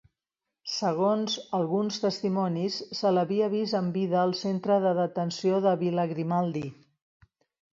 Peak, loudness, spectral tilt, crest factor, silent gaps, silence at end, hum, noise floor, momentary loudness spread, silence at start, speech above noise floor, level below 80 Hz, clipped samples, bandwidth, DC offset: -12 dBFS; -27 LUFS; -6 dB/octave; 16 dB; none; 1 s; none; -88 dBFS; 5 LU; 0.65 s; 61 dB; -72 dBFS; under 0.1%; 7.6 kHz; under 0.1%